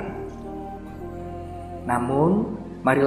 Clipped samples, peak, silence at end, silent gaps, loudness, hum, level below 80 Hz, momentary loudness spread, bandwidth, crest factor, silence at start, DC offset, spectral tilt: under 0.1%; -6 dBFS; 0 s; none; -27 LUFS; none; -46 dBFS; 15 LU; 15 kHz; 20 dB; 0 s; under 0.1%; -8 dB/octave